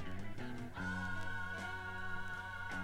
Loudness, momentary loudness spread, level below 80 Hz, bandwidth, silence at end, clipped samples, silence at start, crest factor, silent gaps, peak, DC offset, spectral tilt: -44 LUFS; 6 LU; -54 dBFS; 13.5 kHz; 0 s; under 0.1%; 0 s; 12 dB; none; -30 dBFS; under 0.1%; -5 dB/octave